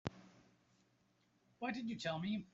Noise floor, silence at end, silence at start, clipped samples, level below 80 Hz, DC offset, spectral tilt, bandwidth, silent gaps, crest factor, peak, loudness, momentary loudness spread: -77 dBFS; 0.05 s; 0.05 s; under 0.1%; -74 dBFS; under 0.1%; -4.5 dB/octave; 7.6 kHz; none; 26 dB; -20 dBFS; -43 LUFS; 9 LU